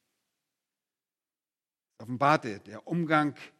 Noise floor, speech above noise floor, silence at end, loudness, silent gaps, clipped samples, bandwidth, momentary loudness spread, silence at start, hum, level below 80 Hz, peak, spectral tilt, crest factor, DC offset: under -90 dBFS; over 61 dB; 0.1 s; -27 LUFS; none; under 0.1%; 12.5 kHz; 15 LU; 2 s; none; -78 dBFS; -8 dBFS; -6.5 dB/octave; 24 dB; under 0.1%